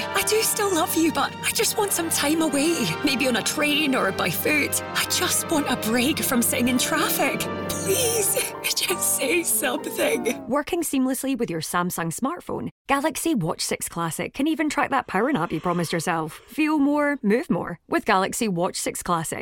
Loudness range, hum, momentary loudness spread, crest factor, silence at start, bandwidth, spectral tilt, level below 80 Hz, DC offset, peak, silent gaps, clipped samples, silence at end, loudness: 4 LU; none; 6 LU; 20 dB; 0 s; 18 kHz; -3 dB/octave; -56 dBFS; under 0.1%; -4 dBFS; 12.72-12.85 s; under 0.1%; 0 s; -23 LUFS